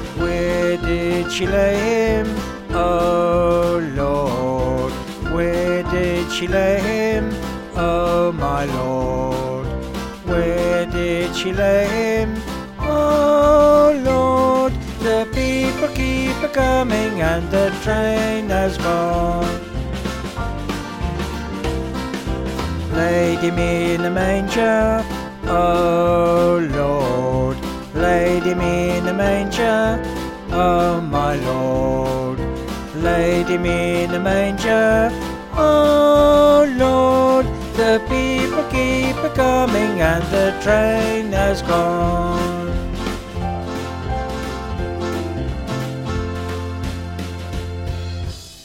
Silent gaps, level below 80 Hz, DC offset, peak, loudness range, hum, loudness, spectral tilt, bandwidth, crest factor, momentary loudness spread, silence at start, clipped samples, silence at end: none; -30 dBFS; under 0.1%; -2 dBFS; 9 LU; none; -18 LUFS; -6 dB/octave; 16.5 kHz; 16 dB; 11 LU; 0 s; under 0.1%; 0 s